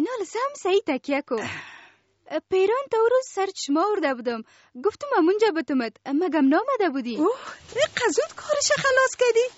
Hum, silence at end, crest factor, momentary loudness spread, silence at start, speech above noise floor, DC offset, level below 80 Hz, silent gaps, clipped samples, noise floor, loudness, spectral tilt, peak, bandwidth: none; 0.05 s; 16 dB; 9 LU; 0 s; 31 dB; under 0.1%; -68 dBFS; none; under 0.1%; -54 dBFS; -24 LUFS; -2 dB/octave; -8 dBFS; 8 kHz